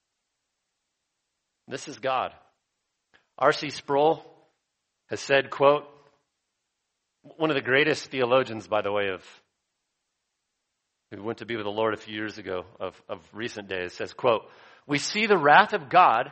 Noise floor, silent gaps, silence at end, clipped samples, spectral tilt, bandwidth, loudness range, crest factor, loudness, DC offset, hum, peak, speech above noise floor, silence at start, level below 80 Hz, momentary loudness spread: -81 dBFS; none; 0 s; under 0.1%; -4 dB/octave; 8.4 kHz; 9 LU; 24 dB; -25 LUFS; under 0.1%; none; -2 dBFS; 56 dB; 1.7 s; -72 dBFS; 17 LU